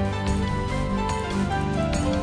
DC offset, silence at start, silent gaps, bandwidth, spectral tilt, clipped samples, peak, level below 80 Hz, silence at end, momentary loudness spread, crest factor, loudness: under 0.1%; 0 s; none; 10.5 kHz; -6 dB/octave; under 0.1%; -12 dBFS; -32 dBFS; 0 s; 2 LU; 12 dB; -25 LUFS